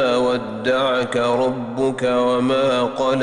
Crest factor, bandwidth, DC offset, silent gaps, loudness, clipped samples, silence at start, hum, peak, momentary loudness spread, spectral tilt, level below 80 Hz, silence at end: 10 dB; 11 kHz; under 0.1%; none; -19 LUFS; under 0.1%; 0 s; none; -8 dBFS; 4 LU; -5.5 dB/octave; -52 dBFS; 0 s